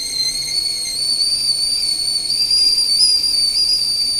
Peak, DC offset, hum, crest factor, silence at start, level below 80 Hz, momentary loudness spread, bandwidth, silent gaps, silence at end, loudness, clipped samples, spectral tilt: -2 dBFS; under 0.1%; none; 16 dB; 0 s; -46 dBFS; 6 LU; 16 kHz; none; 0 s; -14 LUFS; under 0.1%; 1.5 dB/octave